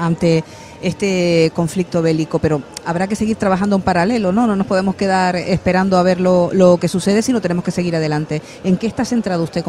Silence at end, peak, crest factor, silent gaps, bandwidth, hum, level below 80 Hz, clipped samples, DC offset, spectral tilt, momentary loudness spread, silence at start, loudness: 0 s; 0 dBFS; 16 dB; none; 12.5 kHz; none; -44 dBFS; under 0.1%; under 0.1%; -6.5 dB/octave; 6 LU; 0 s; -16 LUFS